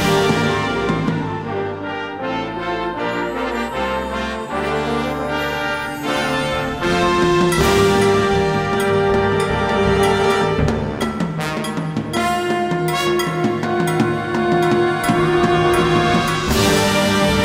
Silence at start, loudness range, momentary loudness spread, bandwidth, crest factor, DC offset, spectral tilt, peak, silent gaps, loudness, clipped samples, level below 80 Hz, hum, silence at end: 0 s; 6 LU; 8 LU; 16 kHz; 16 dB; under 0.1%; -5 dB/octave; -2 dBFS; none; -18 LUFS; under 0.1%; -36 dBFS; none; 0 s